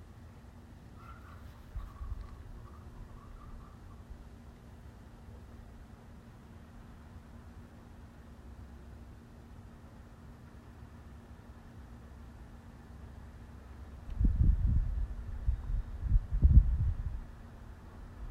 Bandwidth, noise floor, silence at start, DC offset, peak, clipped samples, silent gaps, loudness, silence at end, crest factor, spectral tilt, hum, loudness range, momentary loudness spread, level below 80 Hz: 5.6 kHz; -53 dBFS; 0 s; under 0.1%; -8 dBFS; under 0.1%; none; -34 LUFS; 0 s; 28 dB; -9 dB/octave; none; 21 LU; 21 LU; -38 dBFS